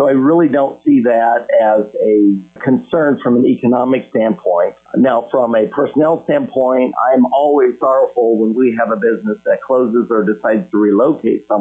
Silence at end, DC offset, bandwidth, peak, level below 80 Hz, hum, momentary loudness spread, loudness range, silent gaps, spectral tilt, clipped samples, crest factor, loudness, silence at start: 0 s; under 0.1%; 3.7 kHz; -2 dBFS; -60 dBFS; none; 5 LU; 1 LU; none; -9.5 dB/octave; under 0.1%; 10 dB; -13 LUFS; 0 s